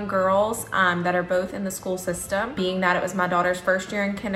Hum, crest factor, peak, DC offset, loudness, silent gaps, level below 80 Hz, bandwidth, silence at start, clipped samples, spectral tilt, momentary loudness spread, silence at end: none; 18 dB; -6 dBFS; under 0.1%; -23 LUFS; none; -52 dBFS; 16 kHz; 0 s; under 0.1%; -4.5 dB/octave; 7 LU; 0 s